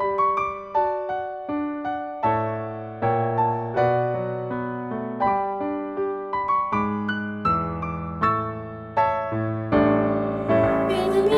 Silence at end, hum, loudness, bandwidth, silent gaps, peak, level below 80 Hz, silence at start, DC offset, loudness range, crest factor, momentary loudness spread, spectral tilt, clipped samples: 0 s; none; -24 LUFS; 12 kHz; none; -6 dBFS; -48 dBFS; 0 s; under 0.1%; 3 LU; 16 dB; 8 LU; -8 dB/octave; under 0.1%